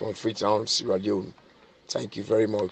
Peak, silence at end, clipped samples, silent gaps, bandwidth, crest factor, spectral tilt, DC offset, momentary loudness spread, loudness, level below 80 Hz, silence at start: -10 dBFS; 0 s; under 0.1%; none; 9 kHz; 18 dB; -4.5 dB/octave; under 0.1%; 9 LU; -27 LUFS; -66 dBFS; 0 s